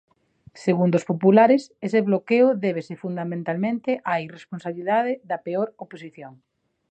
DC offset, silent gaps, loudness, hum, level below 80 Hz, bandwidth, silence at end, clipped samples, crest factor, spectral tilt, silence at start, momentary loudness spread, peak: under 0.1%; none; -22 LUFS; none; -72 dBFS; 8.8 kHz; 0.6 s; under 0.1%; 20 dB; -8 dB/octave; 0.55 s; 16 LU; -4 dBFS